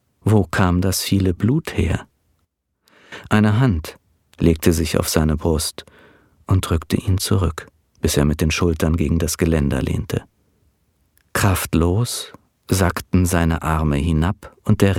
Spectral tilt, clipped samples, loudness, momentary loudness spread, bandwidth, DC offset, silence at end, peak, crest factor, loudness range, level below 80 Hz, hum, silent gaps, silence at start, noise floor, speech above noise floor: -5.5 dB/octave; under 0.1%; -19 LUFS; 9 LU; 17 kHz; under 0.1%; 0 s; 0 dBFS; 20 dB; 2 LU; -32 dBFS; none; none; 0.25 s; -70 dBFS; 52 dB